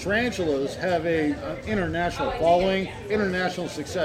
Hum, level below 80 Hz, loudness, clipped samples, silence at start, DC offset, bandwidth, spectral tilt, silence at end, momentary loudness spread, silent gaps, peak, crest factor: none; -44 dBFS; -25 LUFS; under 0.1%; 0 s; under 0.1%; 15.5 kHz; -5.5 dB/octave; 0 s; 7 LU; none; -10 dBFS; 16 dB